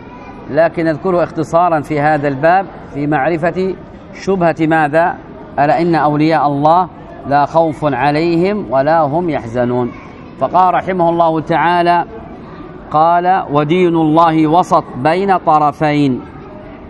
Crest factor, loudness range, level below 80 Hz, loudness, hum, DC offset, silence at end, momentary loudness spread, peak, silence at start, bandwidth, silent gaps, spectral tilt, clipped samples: 14 dB; 3 LU; -44 dBFS; -13 LUFS; none; under 0.1%; 0 s; 14 LU; 0 dBFS; 0 s; 11 kHz; none; -7.5 dB/octave; under 0.1%